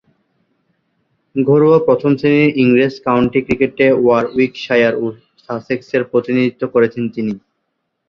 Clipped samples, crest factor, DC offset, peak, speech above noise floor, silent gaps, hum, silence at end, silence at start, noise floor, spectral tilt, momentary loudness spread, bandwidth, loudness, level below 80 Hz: under 0.1%; 14 dB; under 0.1%; 0 dBFS; 57 dB; none; none; 0.7 s; 1.35 s; -71 dBFS; -8 dB/octave; 11 LU; 6.6 kHz; -14 LUFS; -50 dBFS